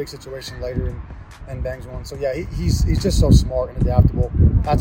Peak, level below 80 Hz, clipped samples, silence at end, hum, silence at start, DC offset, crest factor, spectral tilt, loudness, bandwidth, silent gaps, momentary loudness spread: 0 dBFS; -24 dBFS; under 0.1%; 0 s; none; 0 s; under 0.1%; 18 dB; -7 dB/octave; -20 LUFS; 16.5 kHz; none; 17 LU